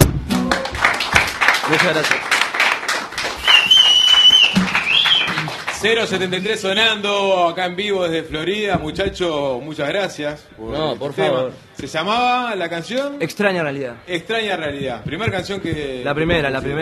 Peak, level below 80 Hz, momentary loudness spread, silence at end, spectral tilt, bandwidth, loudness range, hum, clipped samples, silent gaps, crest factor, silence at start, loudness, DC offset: 0 dBFS; -38 dBFS; 15 LU; 0 s; -3 dB/octave; 13.5 kHz; 10 LU; none; under 0.1%; none; 18 dB; 0 s; -16 LUFS; under 0.1%